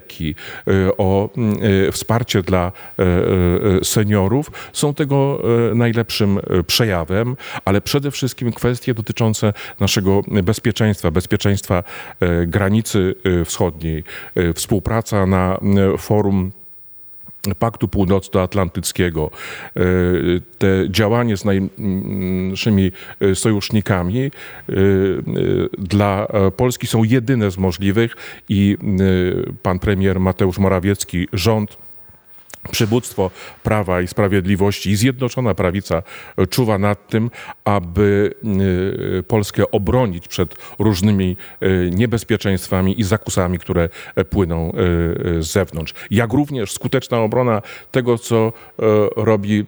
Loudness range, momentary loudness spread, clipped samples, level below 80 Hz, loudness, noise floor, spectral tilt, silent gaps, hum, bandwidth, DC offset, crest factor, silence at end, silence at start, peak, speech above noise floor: 2 LU; 7 LU; under 0.1%; -42 dBFS; -18 LUFS; -41 dBFS; -6 dB/octave; none; none; over 20 kHz; under 0.1%; 18 dB; 0 s; 0.05 s; 0 dBFS; 24 dB